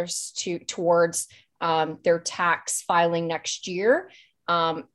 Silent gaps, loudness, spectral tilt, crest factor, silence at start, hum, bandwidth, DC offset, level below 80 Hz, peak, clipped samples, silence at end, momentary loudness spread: none; -24 LUFS; -3 dB/octave; 18 dB; 0 s; none; 13 kHz; under 0.1%; -70 dBFS; -8 dBFS; under 0.1%; 0.15 s; 8 LU